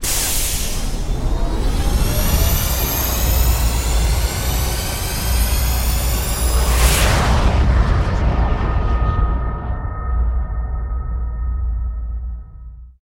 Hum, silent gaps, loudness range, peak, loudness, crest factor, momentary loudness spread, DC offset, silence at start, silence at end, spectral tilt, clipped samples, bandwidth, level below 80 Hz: none; none; 6 LU; -2 dBFS; -19 LUFS; 16 dB; 9 LU; under 0.1%; 0 s; 0.15 s; -4 dB/octave; under 0.1%; 16.5 kHz; -18 dBFS